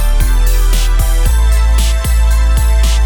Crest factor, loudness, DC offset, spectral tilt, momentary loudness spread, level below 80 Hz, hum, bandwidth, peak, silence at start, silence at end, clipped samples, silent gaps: 8 dB; -13 LUFS; under 0.1%; -4 dB/octave; 2 LU; -10 dBFS; none; 19.5 kHz; -2 dBFS; 0 s; 0 s; under 0.1%; none